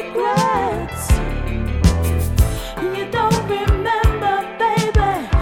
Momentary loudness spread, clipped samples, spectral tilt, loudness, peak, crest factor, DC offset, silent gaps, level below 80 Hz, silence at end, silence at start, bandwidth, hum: 7 LU; under 0.1%; -5.5 dB/octave; -19 LUFS; 0 dBFS; 16 dB; under 0.1%; none; -22 dBFS; 0 s; 0 s; 17 kHz; none